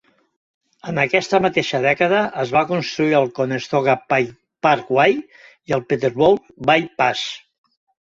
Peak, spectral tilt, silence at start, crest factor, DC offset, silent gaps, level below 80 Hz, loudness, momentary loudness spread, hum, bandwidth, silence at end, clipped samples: -2 dBFS; -5.5 dB/octave; 0.85 s; 18 dB; under 0.1%; none; -58 dBFS; -18 LUFS; 8 LU; none; 7.8 kHz; 0.65 s; under 0.1%